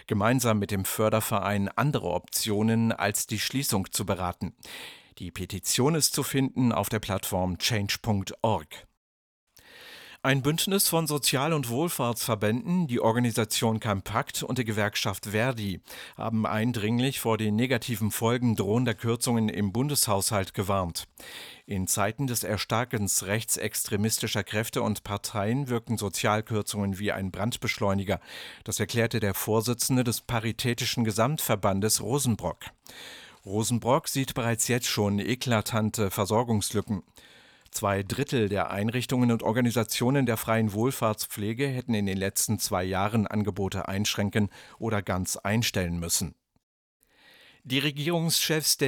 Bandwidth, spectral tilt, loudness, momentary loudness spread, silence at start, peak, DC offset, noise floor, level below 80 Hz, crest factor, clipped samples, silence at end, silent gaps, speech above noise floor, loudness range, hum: 19.5 kHz; -4.5 dB/octave; -27 LUFS; 8 LU; 0.1 s; -8 dBFS; under 0.1%; -57 dBFS; -56 dBFS; 20 dB; under 0.1%; 0 s; 8.97-9.47 s, 46.63-47.00 s; 29 dB; 3 LU; none